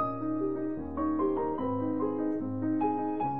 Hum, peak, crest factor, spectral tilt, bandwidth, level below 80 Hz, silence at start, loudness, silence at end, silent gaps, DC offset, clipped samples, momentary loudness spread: none; -18 dBFS; 12 dB; -12 dB/octave; 3.6 kHz; -56 dBFS; 0 s; -31 LUFS; 0 s; none; 0.4%; under 0.1%; 3 LU